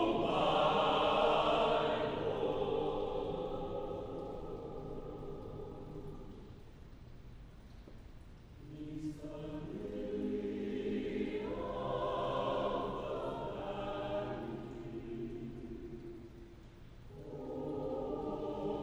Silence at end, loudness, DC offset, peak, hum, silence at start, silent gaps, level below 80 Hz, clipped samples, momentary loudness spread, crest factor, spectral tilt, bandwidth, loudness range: 0 s; -38 LUFS; under 0.1%; -18 dBFS; none; 0 s; none; -54 dBFS; under 0.1%; 25 LU; 20 dB; -6.5 dB/octave; over 20 kHz; 16 LU